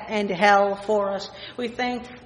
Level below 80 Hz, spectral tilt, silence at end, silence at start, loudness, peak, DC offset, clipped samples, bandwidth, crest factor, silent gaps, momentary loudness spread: -58 dBFS; -4.5 dB/octave; 0 s; 0 s; -23 LUFS; -4 dBFS; under 0.1%; under 0.1%; 10.5 kHz; 20 dB; none; 14 LU